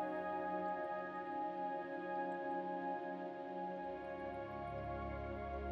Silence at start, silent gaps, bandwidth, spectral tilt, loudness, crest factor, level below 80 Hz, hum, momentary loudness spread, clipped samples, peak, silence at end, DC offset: 0 s; none; 7.4 kHz; -8.5 dB/octave; -44 LUFS; 14 dB; -58 dBFS; none; 5 LU; under 0.1%; -30 dBFS; 0 s; under 0.1%